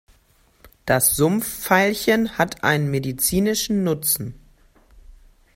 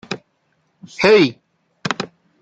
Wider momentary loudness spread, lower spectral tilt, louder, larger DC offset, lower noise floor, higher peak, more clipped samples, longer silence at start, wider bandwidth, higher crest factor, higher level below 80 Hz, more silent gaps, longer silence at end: second, 7 LU vs 19 LU; about the same, -4 dB/octave vs -5 dB/octave; second, -20 LUFS vs -16 LUFS; neither; second, -58 dBFS vs -65 dBFS; about the same, 0 dBFS vs -2 dBFS; neither; first, 0.85 s vs 0.1 s; first, 16.5 kHz vs 8.2 kHz; about the same, 22 dB vs 18 dB; first, -48 dBFS vs -60 dBFS; neither; about the same, 0.45 s vs 0.35 s